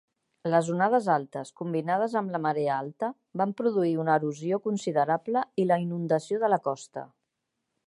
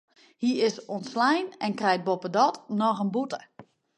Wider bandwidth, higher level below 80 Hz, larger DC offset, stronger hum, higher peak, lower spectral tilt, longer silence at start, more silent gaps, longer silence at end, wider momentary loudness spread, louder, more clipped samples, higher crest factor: about the same, 11.5 kHz vs 11 kHz; about the same, -78 dBFS vs -78 dBFS; neither; neither; about the same, -10 dBFS vs -8 dBFS; first, -7 dB/octave vs -5 dB/octave; about the same, 0.45 s vs 0.4 s; neither; first, 0.8 s vs 0.35 s; about the same, 9 LU vs 8 LU; about the same, -27 LUFS vs -27 LUFS; neither; about the same, 18 dB vs 18 dB